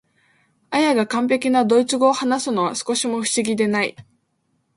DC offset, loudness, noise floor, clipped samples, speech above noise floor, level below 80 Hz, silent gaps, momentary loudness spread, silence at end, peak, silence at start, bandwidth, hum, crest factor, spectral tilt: under 0.1%; -19 LUFS; -68 dBFS; under 0.1%; 49 dB; -66 dBFS; none; 5 LU; 0.75 s; -2 dBFS; 0.7 s; 11.5 kHz; none; 18 dB; -3.5 dB/octave